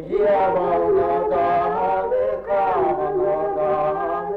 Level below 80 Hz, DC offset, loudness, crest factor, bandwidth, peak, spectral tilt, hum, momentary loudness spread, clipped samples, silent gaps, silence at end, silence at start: -48 dBFS; under 0.1%; -20 LUFS; 8 dB; 5.2 kHz; -10 dBFS; -8.5 dB/octave; none; 3 LU; under 0.1%; none; 0 s; 0 s